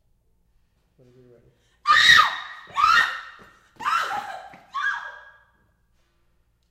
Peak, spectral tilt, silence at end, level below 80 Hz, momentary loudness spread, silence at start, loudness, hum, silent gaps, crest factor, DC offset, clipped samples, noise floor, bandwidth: -2 dBFS; 0.5 dB/octave; 1.5 s; -60 dBFS; 22 LU; 1.85 s; -19 LUFS; none; none; 24 dB; under 0.1%; under 0.1%; -65 dBFS; 16 kHz